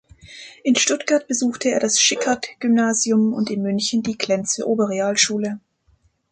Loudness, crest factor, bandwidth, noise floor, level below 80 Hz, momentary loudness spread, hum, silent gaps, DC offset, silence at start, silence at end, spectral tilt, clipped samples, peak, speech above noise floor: -19 LUFS; 18 dB; 9.6 kHz; -61 dBFS; -62 dBFS; 8 LU; none; none; under 0.1%; 0.25 s; 0.75 s; -2.5 dB/octave; under 0.1%; -2 dBFS; 41 dB